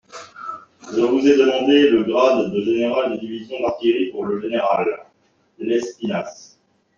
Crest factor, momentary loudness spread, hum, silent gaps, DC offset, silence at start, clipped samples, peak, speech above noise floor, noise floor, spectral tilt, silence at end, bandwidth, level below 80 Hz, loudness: 16 dB; 18 LU; none; none; under 0.1%; 0.15 s; under 0.1%; -2 dBFS; 43 dB; -61 dBFS; -5.5 dB/octave; 0.55 s; 7.4 kHz; -62 dBFS; -19 LUFS